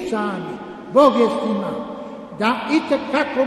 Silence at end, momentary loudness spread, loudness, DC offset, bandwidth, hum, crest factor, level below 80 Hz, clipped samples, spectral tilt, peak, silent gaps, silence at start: 0 s; 17 LU; -19 LUFS; under 0.1%; 12.5 kHz; none; 18 dB; -58 dBFS; under 0.1%; -6 dB/octave; 0 dBFS; none; 0 s